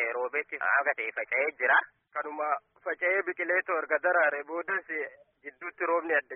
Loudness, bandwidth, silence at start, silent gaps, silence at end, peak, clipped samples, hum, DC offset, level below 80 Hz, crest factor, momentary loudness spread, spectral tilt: -29 LUFS; 3.7 kHz; 0 s; none; 0 s; -12 dBFS; under 0.1%; none; under 0.1%; -86 dBFS; 18 dB; 13 LU; 7 dB/octave